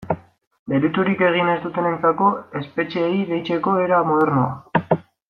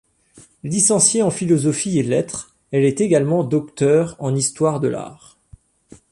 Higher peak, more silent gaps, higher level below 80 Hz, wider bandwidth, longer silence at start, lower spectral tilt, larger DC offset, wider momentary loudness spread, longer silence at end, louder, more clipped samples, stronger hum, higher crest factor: about the same, -4 dBFS vs -2 dBFS; first, 0.47-0.51 s, 0.59-0.66 s vs none; about the same, -60 dBFS vs -56 dBFS; second, 6.2 kHz vs 11.5 kHz; second, 0 s vs 0.35 s; first, -9 dB/octave vs -5 dB/octave; neither; second, 8 LU vs 11 LU; second, 0.3 s vs 0.95 s; about the same, -20 LUFS vs -18 LUFS; neither; neither; about the same, 16 dB vs 18 dB